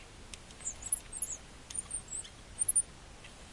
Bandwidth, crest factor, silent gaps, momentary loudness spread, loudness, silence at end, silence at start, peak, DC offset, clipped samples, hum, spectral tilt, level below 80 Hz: 11.5 kHz; 22 dB; none; 21 LU; -35 LUFS; 0 s; 0 s; -18 dBFS; under 0.1%; under 0.1%; none; -0.5 dB/octave; -56 dBFS